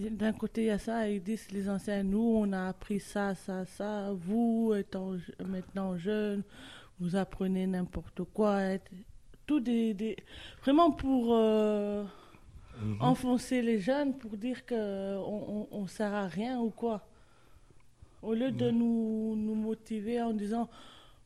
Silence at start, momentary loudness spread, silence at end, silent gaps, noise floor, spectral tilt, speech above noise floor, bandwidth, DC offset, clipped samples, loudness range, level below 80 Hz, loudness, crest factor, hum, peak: 0 s; 11 LU; 0.3 s; none; -60 dBFS; -7 dB/octave; 29 dB; 13 kHz; under 0.1%; under 0.1%; 6 LU; -56 dBFS; -33 LUFS; 20 dB; none; -12 dBFS